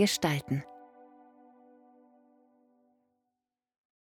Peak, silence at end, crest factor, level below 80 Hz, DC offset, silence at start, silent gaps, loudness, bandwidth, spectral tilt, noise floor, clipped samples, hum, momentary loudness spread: -14 dBFS; 3.15 s; 24 dB; -70 dBFS; under 0.1%; 0 s; none; -31 LUFS; 16 kHz; -4.5 dB/octave; -88 dBFS; under 0.1%; none; 28 LU